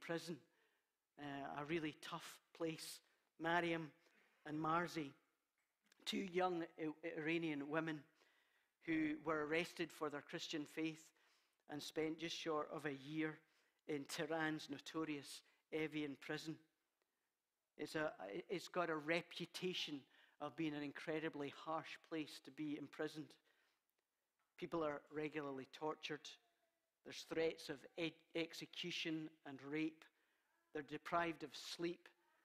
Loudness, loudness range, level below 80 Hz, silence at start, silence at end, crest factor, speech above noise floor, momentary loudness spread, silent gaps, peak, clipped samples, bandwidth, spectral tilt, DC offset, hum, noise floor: -47 LUFS; 5 LU; -84 dBFS; 0 s; 0.35 s; 24 dB; over 44 dB; 12 LU; none; -24 dBFS; under 0.1%; 15.5 kHz; -4.5 dB/octave; under 0.1%; none; under -90 dBFS